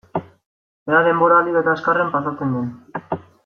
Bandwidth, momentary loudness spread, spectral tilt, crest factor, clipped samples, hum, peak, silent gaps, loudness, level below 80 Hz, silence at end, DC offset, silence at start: 6.4 kHz; 15 LU; -8.5 dB/octave; 18 dB; under 0.1%; none; -2 dBFS; 0.46-0.86 s; -18 LUFS; -62 dBFS; 0.25 s; under 0.1%; 0.15 s